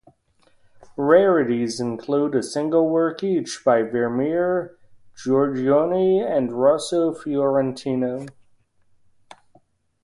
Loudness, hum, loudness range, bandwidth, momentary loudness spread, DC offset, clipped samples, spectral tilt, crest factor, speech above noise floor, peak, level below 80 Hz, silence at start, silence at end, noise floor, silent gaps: -21 LUFS; none; 3 LU; 11.5 kHz; 8 LU; under 0.1%; under 0.1%; -6 dB/octave; 18 dB; 40 dB; -4 dBFS; -64 dBFS; 1 s; 1.7 s; -60 dBFS; none